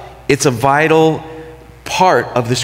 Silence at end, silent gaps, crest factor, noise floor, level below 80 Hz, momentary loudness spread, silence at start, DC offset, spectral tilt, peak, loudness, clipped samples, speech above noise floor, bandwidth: 0 s; none; 14 dB; -34 dBFS; -44 dBFS; 20 LU; 0 s; under 0.1%; -4.5 dB/octave; 0 dBFS; -13 LUFS; under 0.1%; 22 dB; 16.5 kHz